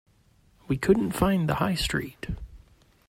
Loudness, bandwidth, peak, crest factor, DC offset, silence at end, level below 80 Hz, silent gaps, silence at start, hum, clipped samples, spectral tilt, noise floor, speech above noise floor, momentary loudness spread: -26 LUFS; 16 kHz; -8 dBFS; 20 dB; under 0.1%; 0.5 s; -42 dBFS; none; 0.7 s; none; under 0.1%; -5.5 dB/octave; -61 dBFS; 36 dB; 14 LU